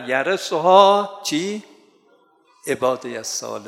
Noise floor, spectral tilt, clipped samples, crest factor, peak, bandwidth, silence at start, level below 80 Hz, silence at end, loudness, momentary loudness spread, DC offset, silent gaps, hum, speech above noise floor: -57 dBFS; -3 dB/octave; under 0.1%; 20 dB; 0 dBFS; 16 kHz; 0 s; -72 dBFS; 0 s; -19 LUFS; 15 LU; under 0.1%; none; none; 39 dB